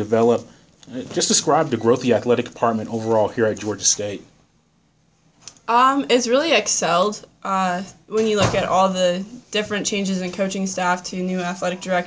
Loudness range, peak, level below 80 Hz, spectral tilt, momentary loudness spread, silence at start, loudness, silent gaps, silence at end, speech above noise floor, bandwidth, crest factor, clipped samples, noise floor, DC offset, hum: 3 LU; -2 dBFS; -52 dBFS; -3.5 dB/octave; 9 LU; 0 s; -20 LUFS; none; 0 s; 41 dB; 8 kHz; 18 dB; under 0.1%; -61 dBFS; under 0.1%; none